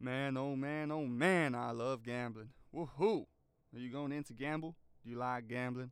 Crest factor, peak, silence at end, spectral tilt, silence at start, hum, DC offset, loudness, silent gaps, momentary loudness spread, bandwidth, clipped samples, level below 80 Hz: 22 dB; -18 dBFS; 0 s; -6.5 dB/octave; 0 s; none; under 0.1%; -39 LUFS; none; 16 LU; 14.5 kHz; under 0.1%; -74 dBFS